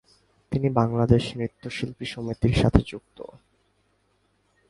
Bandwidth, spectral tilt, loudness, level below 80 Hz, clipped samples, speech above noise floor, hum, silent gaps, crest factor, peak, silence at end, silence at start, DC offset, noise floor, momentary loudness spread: 11.5 kHz; -7.5 dB/octave; -24 LUFS; -38 dBFS; under 0.1%; 44 dB; 50 Hz at -50 dBFS; none; 26 dB; 0 dBFS; 1.45 s; 0.5 s; under 0.1%; -68 dBFS; 19 LU